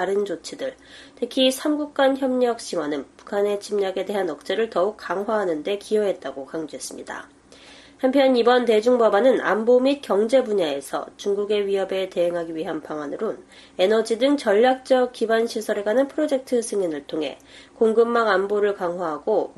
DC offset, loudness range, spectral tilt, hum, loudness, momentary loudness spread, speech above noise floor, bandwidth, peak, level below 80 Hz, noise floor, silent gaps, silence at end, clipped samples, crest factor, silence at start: under 0.1%; 6 LU; -4 dB/octave; none; -22 LUFS; 13 LU; 26 dB; 12.5 kHz; -6 dBFS; -64 dBFS; -47 dBFS; none; 0.05 s; under 0.1%; 16 dB; 0 s